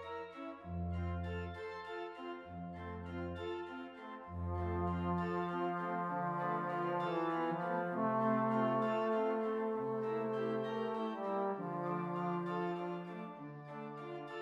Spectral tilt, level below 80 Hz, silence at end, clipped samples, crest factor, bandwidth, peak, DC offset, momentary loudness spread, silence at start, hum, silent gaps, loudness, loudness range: -8.5 dB/octave; -60 dBFS; 0 s; under 0.1%; 16 dB; 7.4 kHz; -22 dBFS; under 0.1%; 13 LU; 0 s; none; none; -39 LUFS; 8 LU